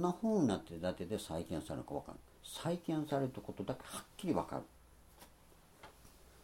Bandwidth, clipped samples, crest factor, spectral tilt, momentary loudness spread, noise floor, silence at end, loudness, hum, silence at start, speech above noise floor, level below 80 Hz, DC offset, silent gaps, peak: 16.5 kHz; under 0.1%; 20 dB; -6 dB/octave; 24 LU; -63 dBFS; 0 s; -40 LUFS; none; 0 s; 24 dB; -64 dBFS; under 0.1%; none; -20 dBFS